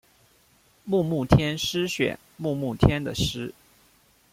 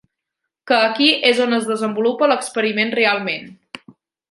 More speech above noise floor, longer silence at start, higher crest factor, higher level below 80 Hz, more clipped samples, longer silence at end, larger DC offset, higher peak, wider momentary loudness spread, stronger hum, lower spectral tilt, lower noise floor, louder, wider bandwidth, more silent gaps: second, 37 dB vs 63 dB; first, 0.85 s vs 0.65 s; first, 24 dB vs 18 dB; first, -40 dBFS vs -72 dBFS; neither; first, 0.8 s vs 0.55 s; neither; about the same, -2 dBFS vs -2 dBFS; second, 12 LU vs 20 LU; neither; first, -5.5 dB/octave vs -3.5 dB/octave; second, -61 dBFS vs -80 dBFS; second, -25 LUFS vs -17 LUFS; first, 16 kHz vs 11.5 kHz; neither